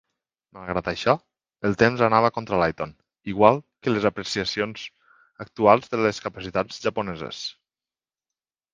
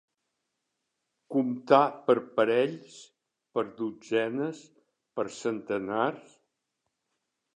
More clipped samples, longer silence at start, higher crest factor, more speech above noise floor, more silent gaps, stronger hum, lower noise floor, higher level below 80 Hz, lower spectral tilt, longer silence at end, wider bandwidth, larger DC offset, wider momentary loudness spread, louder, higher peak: neither; second, 0.55 s vs 1.3 s; about the same, 24 dB vs 24 dB; first, over 67 dB vs 54 dB; neither; neither; first, under -90 dBFS vs -82 dBFS; first, -54 dBFS vs -80 dBFS; about the same, -5.5 dB/octave vs -5.5 dB/octave; about the same, 1.25 s vs 1.35 s; about the same, 9.6 kHz vs 9.4 kHz; neither; first, 16 LU vs 13 LU; first, -23 LUFS vs -28 LUFS; first, 0 dBFS vs -6 dBFS